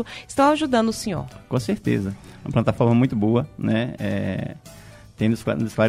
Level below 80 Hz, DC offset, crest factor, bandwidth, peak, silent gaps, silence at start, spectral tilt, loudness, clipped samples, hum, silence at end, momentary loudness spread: -48 dBFS; under 0.1%; 18 dB; 15 kHz; -4 dBFS; none; 0 s; -6.5 dB/octave; -22 LUFS; under 0.1%; none; 0 s; 12 LU